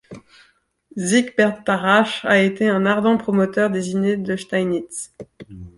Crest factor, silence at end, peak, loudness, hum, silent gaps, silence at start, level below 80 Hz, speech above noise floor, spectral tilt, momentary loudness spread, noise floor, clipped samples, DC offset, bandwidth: 18 dB; 0.1 s; -2 dBFS; -19 LUFS; none; none; 0.1 s; -56 dBFS; 39 dB; -5 dB/octave; 15 LU; -59 dBFS; under 0.1%; under 0.1%; 11.5 kHz